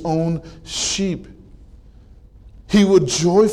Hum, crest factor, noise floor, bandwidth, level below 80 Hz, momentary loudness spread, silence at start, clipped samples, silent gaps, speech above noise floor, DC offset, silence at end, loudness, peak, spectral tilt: none; 16 dB; -44 dBFS; 12.5 kHz; -42 dBFS; 14 LU; 0 s; under 0.1%; none; 28 dB; under 0.1%; 0 s; -18 LUFS; -4 dBFS; -5 dB/octave